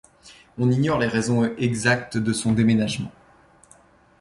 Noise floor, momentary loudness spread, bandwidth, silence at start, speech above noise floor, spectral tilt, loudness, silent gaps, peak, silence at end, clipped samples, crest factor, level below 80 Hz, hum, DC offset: -54 dBFS; 8 LU; 11.5 kHz; 0.25 s; 33 dB; -5.5 dB/octave; -22 LUFS; none; -6 dBFS; 1.1 s; under 0.1%; 18 dB; -52 dBFS; none; under 0.1%